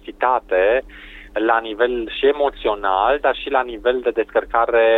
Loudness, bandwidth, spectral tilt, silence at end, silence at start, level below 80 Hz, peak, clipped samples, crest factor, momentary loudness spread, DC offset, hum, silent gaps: -19 LUFS; 4.2 kHz; -6 dB/octave; 0 s; 0.05 s; -44 dBFS; -2 dBFS; under 0.1%; 16 dB; 5 LU; under 0.1%; none; none